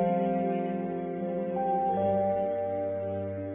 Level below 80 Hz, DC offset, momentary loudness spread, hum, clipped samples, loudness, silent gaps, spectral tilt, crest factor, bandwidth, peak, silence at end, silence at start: -58 dBFS; under 0.1%; 6 LU; none; under 0.1%; -30 LUFS; none; -8 dB/octave; 12 dB; 3.8 kHz; -16 dBFS; 0 s; 0 s